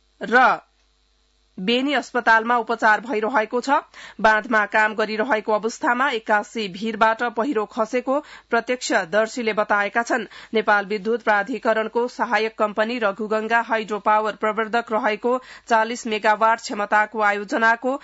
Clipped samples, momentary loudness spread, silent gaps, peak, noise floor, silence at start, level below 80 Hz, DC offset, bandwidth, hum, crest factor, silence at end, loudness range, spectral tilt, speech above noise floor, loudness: under 0.1%; 6 LU; none; -4 dBFS; -63 dBFS; 0.2 s; -64 dBFS; under 0.1%; 8 kHz; none; 16 dB; 0.05 s; 2 LU; -3.5 dB/octave; 42 dB; -21 LUFS